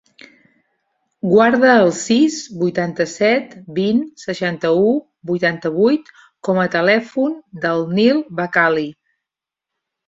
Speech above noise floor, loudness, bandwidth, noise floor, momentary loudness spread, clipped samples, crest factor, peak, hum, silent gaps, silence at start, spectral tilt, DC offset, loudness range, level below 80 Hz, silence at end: 69 dB; -17 LUFS; 7.8 kHz; -85 dBFS; 10 LU; under 0.1%; 16 dB; 0 dBFS; none; none; 1.25 s; -5.5 dB/octave; under 0.1%; 3 LU; -62 dBFS; 1.15 s